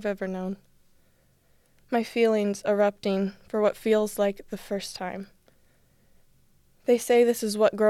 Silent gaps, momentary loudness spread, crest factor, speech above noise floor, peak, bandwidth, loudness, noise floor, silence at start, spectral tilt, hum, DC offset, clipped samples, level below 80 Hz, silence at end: none; 14 LU; 18 dB; 38 dB; -8 dBFS; 16 kHz; -26 LUFS; -63 dBFS; 0 s; -5 dB/octave; none; under 0.1%; under 0.1%; -62 dBFS; 0 s